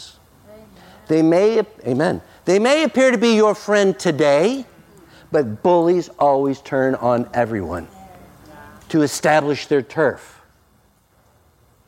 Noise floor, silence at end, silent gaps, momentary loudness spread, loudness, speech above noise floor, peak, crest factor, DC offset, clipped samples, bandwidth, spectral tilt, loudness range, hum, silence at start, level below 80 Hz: -57 dBFS; 1.65 s; none; 8 LU; -18 LUFS; 40 dB; -4 dBFS; 16 dB; under 0.1%; under 0.1%; 16 kHz; -5.5 dB/octave; 5 LU; none; 0 s; -58 dBFS